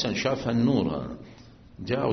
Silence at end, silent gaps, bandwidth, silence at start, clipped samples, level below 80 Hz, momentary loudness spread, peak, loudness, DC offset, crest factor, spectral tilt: 0 s; none; 6.4 kHz; 0 s; under 0.1%; -52 dBFS; 17 LU; -12 dBFS; -26 LUFS; under 0.1%; 16 dB; -5.5 dB/octave